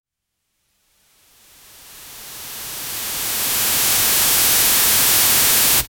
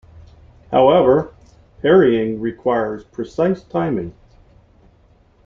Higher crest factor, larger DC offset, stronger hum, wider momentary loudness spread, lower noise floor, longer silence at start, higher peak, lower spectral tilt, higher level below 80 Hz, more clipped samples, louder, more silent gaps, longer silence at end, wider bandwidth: about the same, 16 dB vs 16 dB; neither; neither; first, 18 LU vs 14 LU; first, -76 dBFS vs -53 dBFS; first, 1.85 s vs 0.15 s; about the same, -2 dBFS vs -2 dBFS; second, 0.5 dB/octave vs -8 dB/octave; about the same, -46 dBFS vs -48 dBFS; neither; first, -13 LUFS vs -17 LUFS; neither; second, 0.15 s vs 1.35 s; first, over 20 kHz vs 7 kHz